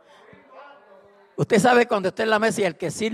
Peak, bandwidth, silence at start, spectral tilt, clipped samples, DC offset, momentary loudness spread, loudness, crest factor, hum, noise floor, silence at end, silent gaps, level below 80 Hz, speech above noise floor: -6 dBFS; 13.5 kHz; 0.55 s; -4.5 dB/octave; under 0.1%; under 0.1%; 11 LU; -21 LUFS; 16 dB; none; -52 dBFS; 0 s; none; -66 dBFS; 31 dB